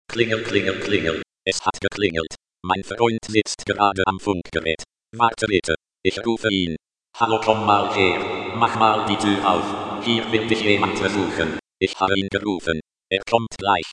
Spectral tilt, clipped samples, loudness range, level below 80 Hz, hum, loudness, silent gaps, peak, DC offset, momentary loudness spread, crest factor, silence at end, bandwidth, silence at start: -4.5 dB/octave; under 0.1%; 3 LU; -52 dBFS; none; -21 LUFS; none; 0 dBFS; under 0.1%; 8 LU; 20 dB; 0 s; 11 kHz; 0.1 s